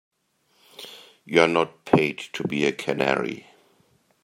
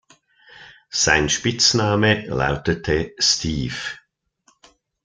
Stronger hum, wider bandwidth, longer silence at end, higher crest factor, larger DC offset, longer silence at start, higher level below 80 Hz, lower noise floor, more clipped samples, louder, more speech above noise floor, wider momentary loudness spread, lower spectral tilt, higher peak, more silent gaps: neither; first, 16 kHz vs 11 kHz; second, 0.85 s vs 1.1 s; about the same, 24 dB vs 20 dB; neither; first, 0.8 s vs 0.55 s; second, -64 dBFS vs -42 dBFS; first, -67 dBFS vs -62 dBFS; neither; second, -23 LUFS vs -19 LUFS; about the same, 44 dB vs 42 dB; first, 21 LU vs 11 LU; first, -5.5 dB/octave vs -3 dB/octave; about the same, -2 dBFS vs -2 dBFS; neither